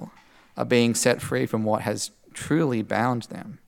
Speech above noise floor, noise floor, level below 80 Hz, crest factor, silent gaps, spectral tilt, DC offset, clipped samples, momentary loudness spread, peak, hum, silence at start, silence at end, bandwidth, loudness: 28 dB; -52 dBFS; -62 dBFS; 20 dB; none; -4.5 dB/octave; under 0.1%; under 0.1%; 16 LU; -6 dBFS; none; 0 s; 0.1 s; 18 kHz; -24 LUFS